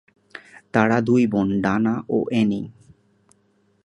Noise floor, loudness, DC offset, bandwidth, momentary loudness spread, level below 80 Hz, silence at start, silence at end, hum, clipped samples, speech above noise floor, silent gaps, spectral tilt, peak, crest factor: -63 dBFS; -21 LUFS; under 0.1%; 10 kHz; 23 LU; -54 dBFS; 0.35 s; 1.15 s; none; under 0.1%; 43 dB; none; -7.5 dB/octave; 0 dBFS; 22 dB